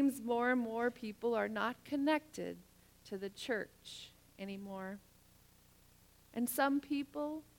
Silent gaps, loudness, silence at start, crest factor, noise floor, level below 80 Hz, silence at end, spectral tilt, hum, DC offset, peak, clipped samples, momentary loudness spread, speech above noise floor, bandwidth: none; -38 LUFS; 0 s; 20 dB; -66 dBFS; -72 dBFS; 0.15 s; -4.5 dB/octave; 60 Hz at -70 dBFS; under 0.1%; -20 dBFS; under 0.1%; 16 LU; 27 dB; 18.5 kHz